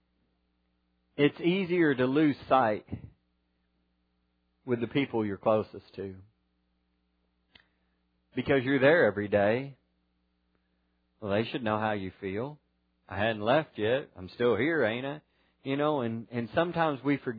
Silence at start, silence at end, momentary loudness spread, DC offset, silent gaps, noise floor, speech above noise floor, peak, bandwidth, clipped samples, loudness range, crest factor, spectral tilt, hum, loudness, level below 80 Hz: 1.2 s; 0 s; 16 LU; under 0.1%; none; -75 dBFS; 47 dB; -10 dBFS; 5 kHz; under 0.1%; 6 LU; 20 dB; -9.5 dB/octave; 60 Hz at -65 dBFS; -28 LUFS; -66 dBFS